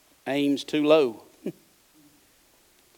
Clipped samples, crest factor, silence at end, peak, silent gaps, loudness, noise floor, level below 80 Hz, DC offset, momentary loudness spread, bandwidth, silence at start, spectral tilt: under 0.1%; 20 dB; 1.45 s; -6 dBFS; none; -24 LUFS; -61 dBFS; -76 dBFS; under 0.1%; 18 LU; 18 kHz; 0.25 s; -5.5 dB/octave